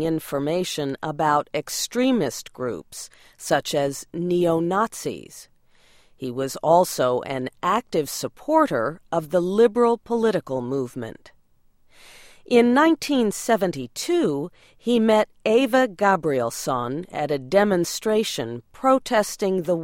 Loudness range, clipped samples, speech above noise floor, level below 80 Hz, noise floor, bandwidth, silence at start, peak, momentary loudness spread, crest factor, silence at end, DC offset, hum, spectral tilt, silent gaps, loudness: 4 LU; under 0.1%; 36 dB; -58 dBFS; -58 dBFS; 16.5 kHz; 0 s; -4 dBFS; 12 LU; 18 dB; 0 s; under 0.1%; none; -4.5 dB/octave; none; -22 LUFS